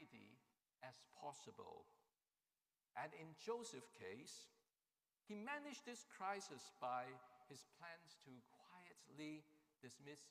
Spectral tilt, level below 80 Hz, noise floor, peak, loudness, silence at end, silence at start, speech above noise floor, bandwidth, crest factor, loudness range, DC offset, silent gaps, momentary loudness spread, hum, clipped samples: -3.5 dB/octave; under -90 dBFS; under -90 dBFS; -36 dBFS; -55 LUFS; 0 s; 0 s; over 35 dB; 15.5 kHz; 22 dB; 7 LU; under 0.1%; none; 16 LU; none; under 0.1%